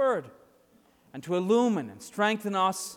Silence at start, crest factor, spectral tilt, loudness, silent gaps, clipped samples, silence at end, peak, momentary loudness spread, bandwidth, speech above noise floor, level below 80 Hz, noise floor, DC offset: 0 s; 16 dB; -4.5 dB/octave; -28 LUFS; none; under 0.1%; 0 s; -14 dBFS; 15 LU; 17.5 kHz; 35 dB; -76 dBFS; -62 dBFS; under 0.1%